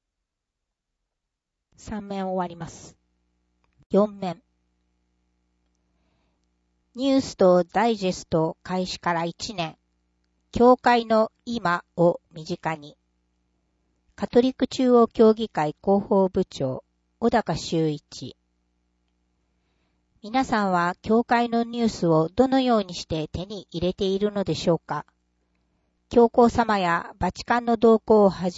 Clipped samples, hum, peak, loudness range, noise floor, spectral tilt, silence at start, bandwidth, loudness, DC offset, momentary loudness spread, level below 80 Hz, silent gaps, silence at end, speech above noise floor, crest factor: under 0.1%; 60 Hz at -50 dBFS; -6 dBFS; 9 LU; -83 dBFS; -6 dB/octave; 1.85 s; 8 kHz; -23 LUFS; under 0.1%; 15 LU; -52 dBFS; 3.86-3.90 s; 0 s; 61 dB; 18 dB